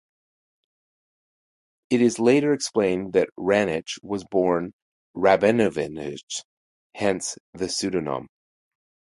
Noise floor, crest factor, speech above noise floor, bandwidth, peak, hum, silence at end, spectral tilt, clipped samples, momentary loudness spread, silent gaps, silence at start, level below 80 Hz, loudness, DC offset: under -90 dBFS; 20 dB; over 67 dB; 11.5 kHz; -4 dBFS; none; 0.85 s; -4.5 dB/octave; under 0.1%; 14 LU; 3.32-3.36 s, 4.73-5.14 s, 6.23-6.27 s, 6.44-6.90 s, 7.40-7.53 s; 1.9 s; -58 dBFS; -23 LUFS; under 0.1%